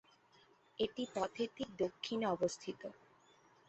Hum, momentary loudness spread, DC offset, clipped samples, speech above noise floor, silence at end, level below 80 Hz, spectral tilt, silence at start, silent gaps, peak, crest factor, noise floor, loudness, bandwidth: none; 12 LU; under 0.1%; under 0.1%; 29 dB; 0.75 s; -74 dBFS; -3.5 dB/octave; 0.8 s; none; -22 dBFS; 18 dB; -69 dBFS; -40 LUFS; 8 kHz